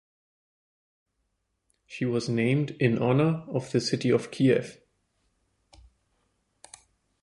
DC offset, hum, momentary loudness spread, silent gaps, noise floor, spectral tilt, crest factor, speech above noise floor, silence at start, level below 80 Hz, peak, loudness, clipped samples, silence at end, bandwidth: under 0.1%; none; 8 LU; none; -77 dBFS; -6.5 dB/octave; 22 dB; 52 dB; 1.9 s; -64 dBFS; -8 dBFS; -26 LUFS; under 0.1%; 2.5 s; 11.5 kHz